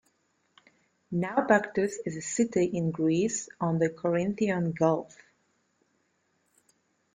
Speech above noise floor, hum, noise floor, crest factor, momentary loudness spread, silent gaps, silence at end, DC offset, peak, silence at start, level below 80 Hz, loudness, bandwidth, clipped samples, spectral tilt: 46 dB; none; -73 dBFS; 20 dB; 8 LU; none; 2.1 s; under 0.1%; -10 dBFS; 1.1 s; -68 dBFS; -28 LUFS; 9.6 kHz; under 0.1%; -6 dB/octave